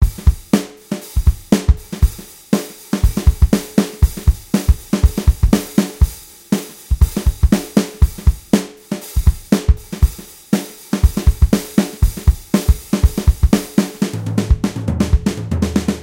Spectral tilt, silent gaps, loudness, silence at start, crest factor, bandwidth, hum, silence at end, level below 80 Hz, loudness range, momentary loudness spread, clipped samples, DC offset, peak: -6.5 dB/octave; none; -17 LUFS; 0 s; 16 dB; 16.5 kHz; none; 0 s; -18 dBFS; 2 LU; 6 LU; under 0.1%; under 0.1%; 0 dBFS